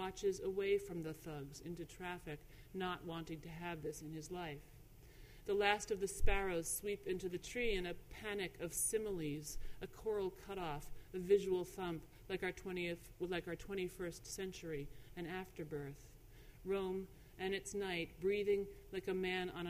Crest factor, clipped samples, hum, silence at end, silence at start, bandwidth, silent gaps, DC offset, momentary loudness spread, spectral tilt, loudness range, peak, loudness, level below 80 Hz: 22 dB; under 0.1%; none; 0 s; 0 s; 15.5 kHz; none; under 0.1%; 13 LU; -4 dB/octave; 7 LU; -20 dBFS; -42 LUFS; -52 dBFS